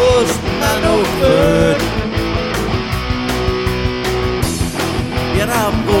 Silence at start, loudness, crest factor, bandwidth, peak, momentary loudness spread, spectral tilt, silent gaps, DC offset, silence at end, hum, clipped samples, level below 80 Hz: 0 s; -16 LUFS; 14 dB; 17 kHz; -2 dBFS; 6 LU; -5 dB/octave; none; under 0.1%; 0 s; none; under 0.1%; -26 dBFS